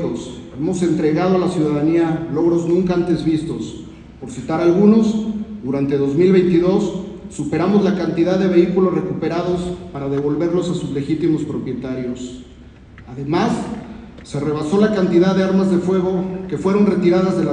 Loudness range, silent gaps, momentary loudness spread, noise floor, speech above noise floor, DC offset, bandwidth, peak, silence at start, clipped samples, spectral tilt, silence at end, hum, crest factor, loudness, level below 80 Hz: 6 LU; none; 14 LU; -40 dBFS; 23 dB; under 0.1%; 9.8 kHz; 0 dBFS; 0 s; under 0.1%; -7.5 dB/octave; 0 s; none; 16 dB; -18 LUFS; -44 dBFS